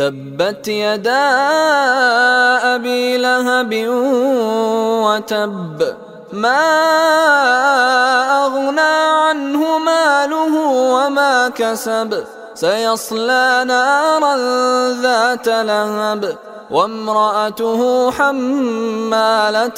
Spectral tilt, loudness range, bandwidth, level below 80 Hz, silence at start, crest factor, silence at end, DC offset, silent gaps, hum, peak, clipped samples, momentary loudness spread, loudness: -3 dB/octave; 3 LU; 16 kHz; -62 dBFS; 0 s; 14 dB; 0 s; under 0.1%; none; none; 0 dBFS; under 0.1%; 8 LU; -14 LUFS